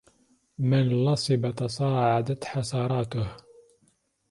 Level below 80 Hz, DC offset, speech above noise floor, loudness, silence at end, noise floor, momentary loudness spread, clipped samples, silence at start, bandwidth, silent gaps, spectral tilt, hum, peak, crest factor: -56 dBFS; under 0.1%; 43 dB; -26 LUFS; 0.95 s; -68 dBFS; 7 LU; under 0.1%; 0.6 s; 11.5 kHz; none; -6.5 dB/octave; none; -10 dBFS; 18 dB